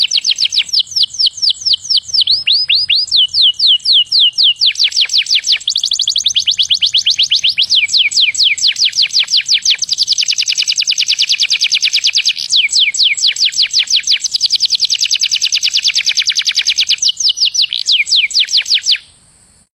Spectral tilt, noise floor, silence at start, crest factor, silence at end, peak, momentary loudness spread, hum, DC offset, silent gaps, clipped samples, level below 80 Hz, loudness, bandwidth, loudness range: 5 dB/octave; -48 dBFS; 0 s; 12 dB; 0.75 s; 0 dBFS; 3 LU; none; under 0.1%; none; under 0.1%; -58 dBFS; -9 LUFS; 16.5 kHz; 2 LU